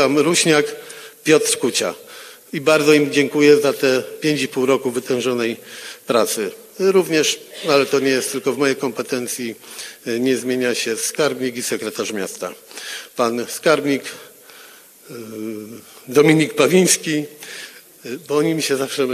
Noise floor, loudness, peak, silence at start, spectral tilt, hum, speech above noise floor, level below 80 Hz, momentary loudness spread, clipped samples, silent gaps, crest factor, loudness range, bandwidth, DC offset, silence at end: -44 dBFS; -18 LUFS; 0 dBFS; 0 s; -3.5 dB/octave; none; 26 dB; -72 dBFS; 18 LU; under 0.1%; none; 18 dB; 6 LU; 15 kHz; under 0.1%; 0 s